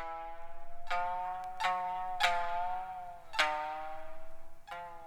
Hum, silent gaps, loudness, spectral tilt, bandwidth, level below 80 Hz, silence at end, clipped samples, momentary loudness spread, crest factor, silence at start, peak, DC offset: none; none; -36 LUFS; -1.5 dB/octave; 15 kHz; -50 dBFS; 0 s; under 0.1%; 18 LU; 22 dB; 0 s; -14 dBFS; under 0.1%